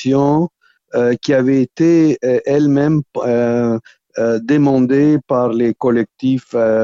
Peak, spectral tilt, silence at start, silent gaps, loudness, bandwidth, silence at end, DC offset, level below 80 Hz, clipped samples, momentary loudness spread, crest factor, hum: -2 dBFS; -8 dB/octave; 0 s; none; -15 LUFS; 7.4 kHz; 0 s; under 0.1%; -54 dBFS; under 0.1%; 6 LU; 12 dB; none